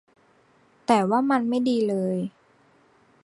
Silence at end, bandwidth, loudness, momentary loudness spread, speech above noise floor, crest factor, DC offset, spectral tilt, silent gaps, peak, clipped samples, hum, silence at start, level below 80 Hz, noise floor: 0.95 s; 11.5 kHz; -24 LUFS; 11 LU; 38 dB; 20 dB; under 0.1%; -6.5 dB/octave; none; -6 dBFS; under 0.1%; none; 0.9 s; -72 dBFS; -60 dBFS